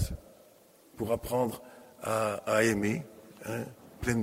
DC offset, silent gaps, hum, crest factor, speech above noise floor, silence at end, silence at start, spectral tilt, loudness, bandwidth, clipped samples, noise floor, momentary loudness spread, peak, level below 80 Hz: under 0.1%; none; none; 20 dB; 29 dB; 0 s; 0 s; -5.5 dB/octave; -32 LUFS; 16 kHz; under 0.1%; -59 dBFS; 18 LU; -14 dBFS; -50 dBFS